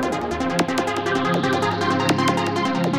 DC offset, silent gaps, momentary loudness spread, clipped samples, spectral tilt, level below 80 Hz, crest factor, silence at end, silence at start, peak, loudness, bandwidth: under 0.1%; none; 3 LU; under 0.1%; -5 dB/octave; -48 dBFS; 14 dB; 0 s; 0 s; -8 dBFS; -21 LUFS; 17 kHz